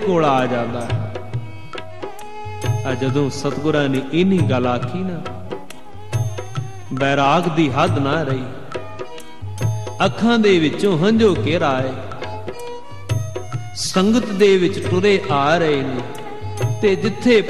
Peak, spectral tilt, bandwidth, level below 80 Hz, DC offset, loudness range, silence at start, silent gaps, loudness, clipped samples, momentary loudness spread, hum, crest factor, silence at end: -2 dBFS; -6 dB/octave; 13.5 kHz; -50 dBFS; 3%; 4 LU; 0 s; none; -19 LUFS; under 0.1%; 17 LU; none; 16 dB; 0 s